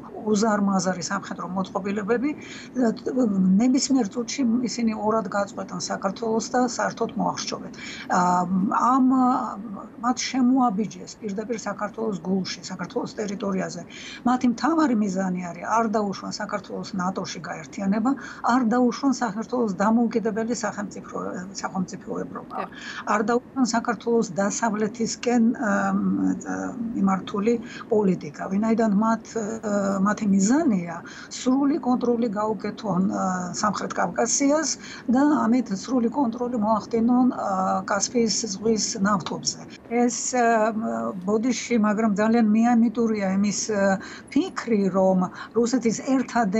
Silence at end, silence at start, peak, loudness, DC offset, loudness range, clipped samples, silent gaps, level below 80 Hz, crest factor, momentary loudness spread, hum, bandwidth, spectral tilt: 0 s; 0 s; -8 dBFS; -24 LUFS; under 0.1%; 4 LU; under 0.1%; none; -62 dBFS; 14 dB; 10 LU; none; 8.4 kHz; -5 dB/octave